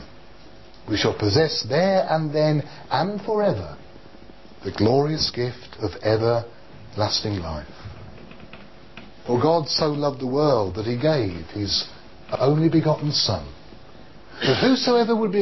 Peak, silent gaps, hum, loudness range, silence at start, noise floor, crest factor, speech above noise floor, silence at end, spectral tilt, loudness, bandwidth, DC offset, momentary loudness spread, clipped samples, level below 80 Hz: -6 dBFS; none; none; 4 LU; 0 s; -47 dBFS; 16 dB; 25 dB; 0 s; -6 dB/octave; -22 LUFS; 6.2 kHz; 0.6%; 18 LU; under 0.1%; -46 dBFS